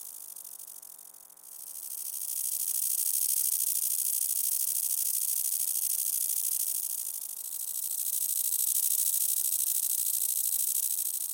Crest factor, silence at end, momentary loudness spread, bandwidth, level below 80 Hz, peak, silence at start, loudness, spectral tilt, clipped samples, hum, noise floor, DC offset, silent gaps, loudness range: 18 dB; 0 s; 16 LU; 17 kHz; under -90 dBFS; -12 dBFS; 0 s; -27 LUFS; 5 dB/octave; under 0.1%; none; -51 dBFS; under 0.1%; none; 3 LU